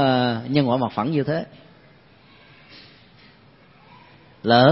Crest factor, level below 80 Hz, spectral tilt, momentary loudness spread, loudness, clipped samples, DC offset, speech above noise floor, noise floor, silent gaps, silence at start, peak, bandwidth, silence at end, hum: 22 dB; -62 dBFS; -11 dB/octave; 26 LU; -21 LUFS; under 0.1%; under 0.1%; 33 dB; -52 dBFS; none; 0 s; -2 dBFS; 5.8 kHz; 0 s; none